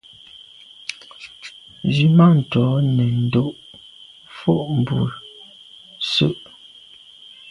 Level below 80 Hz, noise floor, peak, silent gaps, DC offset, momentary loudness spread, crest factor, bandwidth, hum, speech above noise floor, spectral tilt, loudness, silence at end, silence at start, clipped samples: -54 dBFS; -45 dBFS; -2 dBFS; none; under 0.1%; 26 LU; 18 dB; 11 kHz; none; 29 dB; -7.5 dB/octave; -18 LUFS; 1.1 s; 0.9 s; under 0.1%